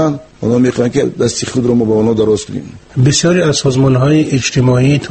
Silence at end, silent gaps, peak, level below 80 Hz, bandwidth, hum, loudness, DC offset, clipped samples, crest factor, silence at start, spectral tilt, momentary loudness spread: 0 s; none; 0 dBFS; -40 dBFS; 8.8 kHz; none; -12 LUFS; under 0.1%; under 0.1%; 12 dB; 0 s; -5.5 dB/octave; 6 LU